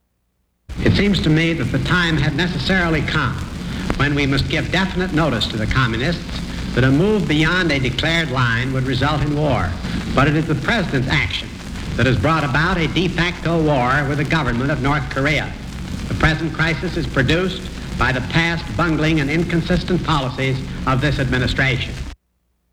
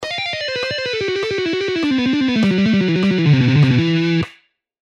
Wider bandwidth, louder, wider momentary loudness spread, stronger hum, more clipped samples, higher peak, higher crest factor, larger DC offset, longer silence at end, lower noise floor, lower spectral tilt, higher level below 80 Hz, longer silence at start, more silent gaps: first, 14 kHz vs 9.2 kHz; about the same, -18 LUFS vs -17 LUFS; about the same, 8 LU vs 8 LU; neither; neither; first, 0 dBFS vs -4 dBFS; about the same, 18 dB vs 14 dB; neither; about the same, 0.6 s vs 0.5 s; first, -67 dBFS vs -53 dBFS; about the same, -6 dB/octave vs -6.5 dB/octave; first, -30 dBFS vs -52 dBFS; first, 0.7 s vs 0 s; neither